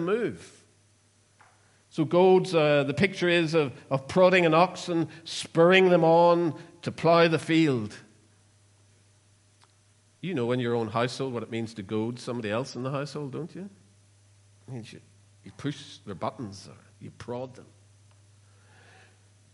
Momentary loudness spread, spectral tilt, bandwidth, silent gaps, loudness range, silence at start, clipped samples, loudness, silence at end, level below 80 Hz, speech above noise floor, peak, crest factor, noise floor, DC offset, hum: 21 LU; -6 dB/octave; 11.5 kHz; none; 18 LU; 0 s; under 0.1%; -25 LUFS; 1.9 s; -70 dBFS; 38 dB; -6 dBFS; 22 dB; -63 dBFS; under 0.1%; none